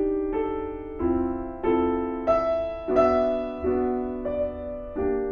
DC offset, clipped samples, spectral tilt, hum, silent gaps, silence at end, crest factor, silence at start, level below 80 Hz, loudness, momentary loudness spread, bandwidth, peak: under 0.1%; under 0.1%; -8.5 dB/octave; none; none; 0 s; 16 dB; 0 s; -42 dBFS; -26 LUFS; 8 LU; 6.6 kHz; -10 dBFS